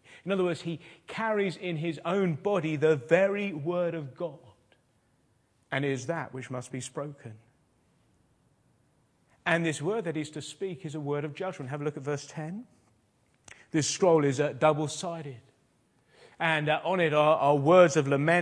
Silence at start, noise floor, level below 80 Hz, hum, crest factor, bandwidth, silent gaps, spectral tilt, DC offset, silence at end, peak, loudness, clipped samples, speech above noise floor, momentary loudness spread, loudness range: 0.1 s; -69 dBFS; -74 dBFS; none; 22 dB; 10.5 kHz; none; -5.5 dB/octave; under 0.1%; 0 s; -8 dBFS; -28 LUFS; under 0.1%; 41 dB; 15 LU; 9 LU